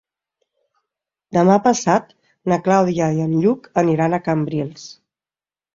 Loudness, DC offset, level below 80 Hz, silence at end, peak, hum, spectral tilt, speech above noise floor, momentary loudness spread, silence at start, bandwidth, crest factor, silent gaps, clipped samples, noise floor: -18 LUFS; under 0.1%; -58 dBFS; 0.85 s; -2 dBFS; none; -6.5 dB/octave; over 73 dB; 12 LU; 1.3 s; 7.6 kHz; 18 dB; none; under 0.1%; under -90 dBFS